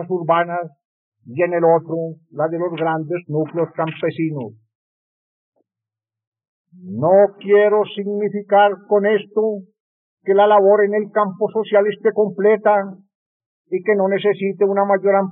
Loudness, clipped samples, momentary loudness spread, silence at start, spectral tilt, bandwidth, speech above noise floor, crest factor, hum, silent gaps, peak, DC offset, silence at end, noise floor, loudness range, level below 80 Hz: -17 LUFS; under 0.1%; 12 LU; 0 s; -5 dB/octave; 4 kHz; 71 dB; 14 dB; none; 0.85-1.12 s, 4.75-5.52 s, 6.27-6.32 s, 6.48-6.65 s, 9.80-10.17 s, 13.15-13.40 s, 13.46-13.65 s; -4 dBFS; under 0.1%; 0 s; -88 dBFS; 8 LU; under -90 dBFS